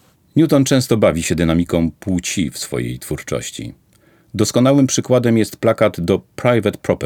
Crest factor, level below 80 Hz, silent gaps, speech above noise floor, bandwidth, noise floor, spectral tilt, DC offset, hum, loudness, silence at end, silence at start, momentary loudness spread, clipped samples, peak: 16 dB; -44 dBFS; none; 37 dB; 18 kHz; -53 dBFS; -5.5 dB/octave; under 0.1%; none; -17 LUFS; 0 s; 0.35 s; 11 LU; under 0.1%; -2 dBFS